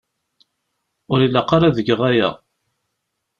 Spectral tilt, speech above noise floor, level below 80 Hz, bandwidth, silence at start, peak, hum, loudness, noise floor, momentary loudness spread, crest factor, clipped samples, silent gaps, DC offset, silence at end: -7.5 dB/octave; 60 dB; -50 dBFS; 7 kHz; 1.1 s; -2 dBFS; none; -17 LUFS; -76 dBFS; 5 LU; 18 dB; under 0.1%; none; under 0.1%; 1.05 s